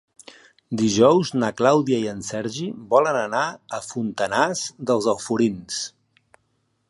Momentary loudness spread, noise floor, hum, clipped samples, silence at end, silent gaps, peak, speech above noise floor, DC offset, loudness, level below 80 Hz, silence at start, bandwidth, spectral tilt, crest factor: 12 LU; -69 dBFS; none; under 0.1%; 1 s; none; -2 dBFS; 48 dB; under 0.1%; -22 LUFS; -60 dBFS; 0.7 s; 11.5 kHz; -4.5 dB/octave; 20 dB